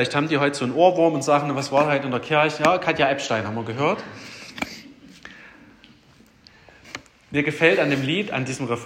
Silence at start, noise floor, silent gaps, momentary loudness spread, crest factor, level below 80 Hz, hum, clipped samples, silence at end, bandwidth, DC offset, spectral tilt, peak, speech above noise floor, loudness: 0 s; -53 dBFS; none; 20 LU; 20 dB; -62 dBFS; none; under 0.1%; 0 s; 16 kHz; under 0.1%; -5 dB/octave; -2 dBFS; 33 dB; -21 LUFS